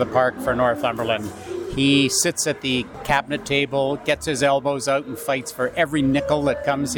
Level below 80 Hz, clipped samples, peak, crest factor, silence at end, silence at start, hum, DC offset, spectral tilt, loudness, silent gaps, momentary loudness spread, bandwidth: -46 dBFS; under 0.1%; -4 dBFS; 16 dB; 0 s; 0 s; none; under 0.1%; -4 dB/octave; -21 LUFS; none; 7 LU; 19 kHz